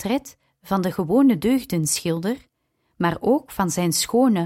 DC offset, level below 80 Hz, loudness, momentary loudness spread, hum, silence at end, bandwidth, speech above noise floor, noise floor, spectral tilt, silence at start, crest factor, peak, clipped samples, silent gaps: under 0.1%; -54 dBFS; -21 LUFS; 8 LU; none; 0 s; 16.5 kHz; 46 dB; -67 dBFS; -5 dB/octave; 0 s; 14 dB; -8 dBFS; under 0.1%; none